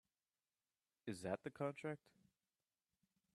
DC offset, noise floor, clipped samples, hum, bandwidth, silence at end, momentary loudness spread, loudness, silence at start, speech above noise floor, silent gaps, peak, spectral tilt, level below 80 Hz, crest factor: under 0.1%; under -90 dBFS; under 0.1%; none; 12.5 kHz; 1.4 s; 9 LU; -49 LUFS; 1.05 s; over 42 dB; none; -28 dBFS; -6 dB/octave; -86 dBFS; 24 dB